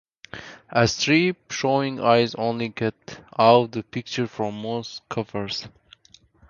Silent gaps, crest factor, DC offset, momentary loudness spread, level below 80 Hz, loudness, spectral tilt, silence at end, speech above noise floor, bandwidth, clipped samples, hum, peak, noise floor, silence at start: none; 22 dB; under 0.1%; 18 LU; -58 dBFS; -23 LUFS; -5 dB/octave; 0.8 s; 33 dB; 7.4 kHz; under 0.1%; none; -2 dBFS; -55 dBFS; 0.35 s